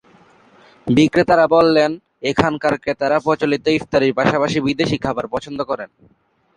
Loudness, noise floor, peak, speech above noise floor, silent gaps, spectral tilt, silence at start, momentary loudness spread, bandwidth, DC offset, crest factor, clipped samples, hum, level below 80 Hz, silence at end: -17 LUFS; -50 dBFS; 0 dBFS; 34 dB; none; -6 dB/octave; 0.85 s; 12 LU; 10.5 kHz; under 0.1%; 18 dB; under 0.1%; none; -48 dBFS; 0.7 s